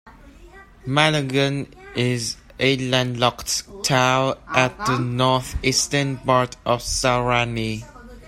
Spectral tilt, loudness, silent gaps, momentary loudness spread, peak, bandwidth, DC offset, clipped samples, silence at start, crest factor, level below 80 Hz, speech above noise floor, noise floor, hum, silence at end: -4 dB/octave; -21 LUFS; none; 7 LU; 0 dBFS; 15.5 kHz; under 0.1%; under 0.1%; 0.05 s; 22 dB; -42 dBFS; 24 dB; -45 dBFS; none; 0 s